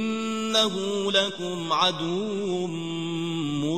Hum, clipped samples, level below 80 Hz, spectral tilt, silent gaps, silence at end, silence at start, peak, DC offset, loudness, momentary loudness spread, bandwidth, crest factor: none; under 0.1%; -62 dBFS; -4 dB/octave; none; 0 s; 0 s; -8 dBFS; 0.3%; -25 LUFS; 8 LU; 13.5 kHz; 20 dB